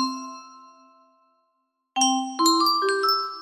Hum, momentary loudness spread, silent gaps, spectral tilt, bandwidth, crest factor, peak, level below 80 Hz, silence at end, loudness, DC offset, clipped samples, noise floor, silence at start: none; 17 LU; none; 0.5 dB/octave; 15.5 kHz; 18 dB; -6 dBFS; -78 dBFS; 0 s; -21 LUFS; under 0.1%; under 0.1%; -74 dBFS; 0 s